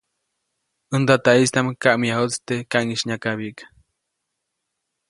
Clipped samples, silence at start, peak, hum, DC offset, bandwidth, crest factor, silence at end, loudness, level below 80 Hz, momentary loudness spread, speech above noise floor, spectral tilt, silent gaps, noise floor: under 0.1%; 0.9 s; 0 dBFS; none; under 0.1%; 11.5 kHz; 22 dB; 1.45 s; -20 LUFS; -62 dBFS; 11 LU; 59 dB; -4.5 dB/octave; none; -78 dBFS